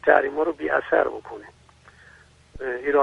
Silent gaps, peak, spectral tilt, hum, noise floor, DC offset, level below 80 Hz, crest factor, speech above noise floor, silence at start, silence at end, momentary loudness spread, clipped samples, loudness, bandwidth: none; -2 dBFS; -6 dB/octave; none; -52 dBFS; under 0.1%; -54 dBFS; 22 dB; 30 dB; 0.05 s; 0 s; 19 LU; under 0.1%; -23 LUFS; 9.4 kHz